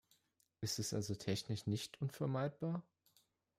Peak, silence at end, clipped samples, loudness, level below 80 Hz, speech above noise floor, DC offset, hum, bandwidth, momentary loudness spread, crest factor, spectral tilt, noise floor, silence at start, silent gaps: -26 dBFS; 0.75 s; under 0.1%; -42 LUFS; -74 dBFS; 38 dB; under 0.1%; none; 16 kHz; 4 LU; 16 dB; -5 dB/octave; -79 dBFS; 0.6 s; none